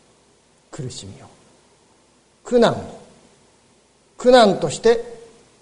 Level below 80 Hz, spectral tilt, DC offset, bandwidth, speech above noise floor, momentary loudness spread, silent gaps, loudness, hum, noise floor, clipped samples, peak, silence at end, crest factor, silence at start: -50 dBFS; -4.5 dB/octave; under 0.1%; 10.5 kHz; 40 dB; 25 LU; none; -17 LUFS; none; -57 dBFS; under 0.1%; 0 dBFS; 0.45 s; 20 dB; 0.75 s